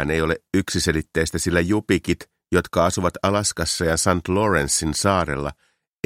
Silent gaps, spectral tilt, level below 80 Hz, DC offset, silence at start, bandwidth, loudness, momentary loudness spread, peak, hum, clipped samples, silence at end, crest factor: none; -4 dB/octave; -40 dBFS; under 0.1%; 0 s; 16.5 kHz; -21 LUFS; 4 LU; -2 dBFS; none; under 0.1%; 0.55 s; 20 dB